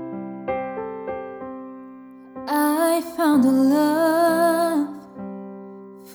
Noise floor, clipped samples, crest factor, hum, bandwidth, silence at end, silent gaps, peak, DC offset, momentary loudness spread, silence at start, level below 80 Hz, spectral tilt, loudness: -42 dBFS; under 0.1%; 14 dB; none; over 20 kHz; 0 s; none; -8 dBFS; under 0.1%; 21 LU; 0 s; -62 dBFS; -5 dB/octave; -21 LUFS